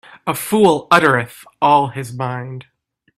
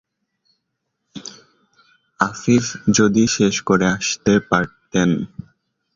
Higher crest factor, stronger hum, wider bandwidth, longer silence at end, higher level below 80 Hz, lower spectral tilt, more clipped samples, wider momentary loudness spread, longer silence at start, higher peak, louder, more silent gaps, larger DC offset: about the same, 18 dB vs 18 dB; neither; first, 16 kHz vs 7.6 kHz; second, 0.55 s vs 0.7 s; second, -58 dBFS vs -50 dBFS; about the same, -5 dB/octave vs -4.5 dB/octave; neither; second, 17 LU vs 20 LU; second, 0.25 s vs 1.15 s; about the same, 0 dBFS vs -2 dBFS; about the same, -16 LUFS vs -18 LUFS; neither; neither